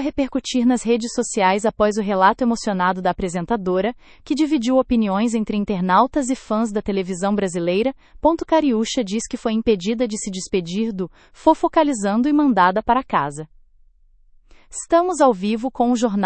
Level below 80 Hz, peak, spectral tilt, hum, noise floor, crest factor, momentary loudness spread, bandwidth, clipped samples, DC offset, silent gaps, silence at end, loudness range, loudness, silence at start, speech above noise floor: -46 dBFS; -2 dBFS; -5 dB/octave; none; -52 dBFS; 18 dB; 7 LU; 8.8 kHz; under 0.1%; under 0.1%; none; 0 s; 2 LU; -20 LUFS; 0 s; 33 dB